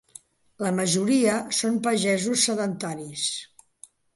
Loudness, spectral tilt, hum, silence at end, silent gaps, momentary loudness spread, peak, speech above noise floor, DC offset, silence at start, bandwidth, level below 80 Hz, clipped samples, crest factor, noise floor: -24 LUFS; -3.5 dB/octave; none; 0.7 s; none; 9 LU; -6 dBFS; 29 dB; under 0.1%; 0.6 s; 12 kHz; -70 dBFS; under 0.1%; 18 dB; -53 dBFS